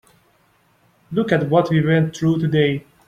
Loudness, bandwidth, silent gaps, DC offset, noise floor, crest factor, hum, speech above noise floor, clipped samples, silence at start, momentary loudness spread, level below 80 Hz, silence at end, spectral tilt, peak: -18 LUFS; 7.8 kHz; none; under 0.1%; -59 dBFS; 18 dB; none; 42 dB; under 0.1%; 1.1 s; 5 LU; -54 dBFS; 0.25 s; -7.5 dB/octave; -2 dBFS